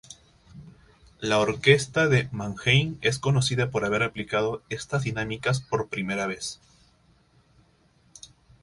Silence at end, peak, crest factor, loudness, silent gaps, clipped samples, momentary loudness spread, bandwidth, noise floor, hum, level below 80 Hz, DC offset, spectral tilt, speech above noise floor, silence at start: 2.05 s; -4 dBFS; 22 dB; -25 LUFS; none; under 0.1%; 11 LU; 11.5 kHz; -62 dBFS; none; -54 dBFS; under 0.1%; -5 dB/octave; 37 dB; 0.1 s